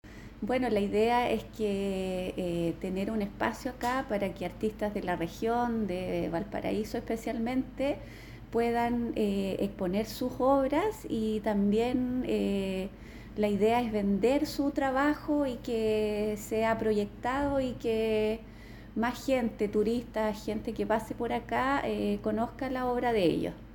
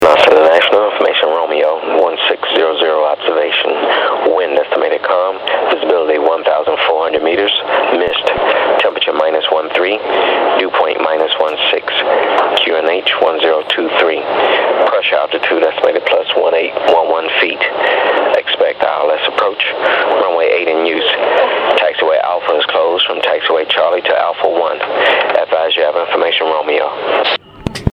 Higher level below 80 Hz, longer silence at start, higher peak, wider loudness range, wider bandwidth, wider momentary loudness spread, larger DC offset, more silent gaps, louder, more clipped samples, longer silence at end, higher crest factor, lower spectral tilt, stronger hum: second, -50 dBFS vs -44 dBFS; about the same, 0.05 s vs 0 s; second, -14 dBFS vs 0 dBFS; about the same, 3 LU vs 1 LU; first, 19 kHz vs 9.6 kHz; first, 7 LU vs 2 LU; neither; neither; second, -31 LUFS vs -12 LUFS; neither; about the same, 0 s vs 0 s; first, 18 dB vs 12 dB; first, -6 dB/octave vs -4.5 dB/octave; neither